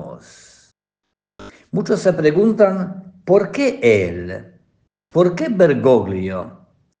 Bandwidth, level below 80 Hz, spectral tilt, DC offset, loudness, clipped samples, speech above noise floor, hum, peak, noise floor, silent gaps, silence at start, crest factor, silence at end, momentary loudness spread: 9.4 kHz; -56 dBFS; -7 dB/octave; under 0.1%; -16 LUFS; under 0.1%; 63 dB; none; 0 dBFS; -79 dBFS; none; 0 s; 18 dB; 0.5 s; 15 LU